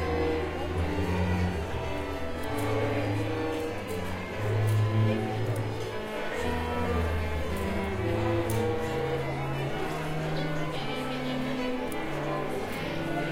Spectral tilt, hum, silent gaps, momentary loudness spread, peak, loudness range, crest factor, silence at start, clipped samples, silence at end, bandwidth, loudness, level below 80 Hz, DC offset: -6.5 dB/octave; none; none; 5 LU; -16 dBFS; 2 LU; 14 dB; 0 s; under 0.1%; 0 s; 16 kHz; -31 LUFS; -42 dBFS; under 0.1%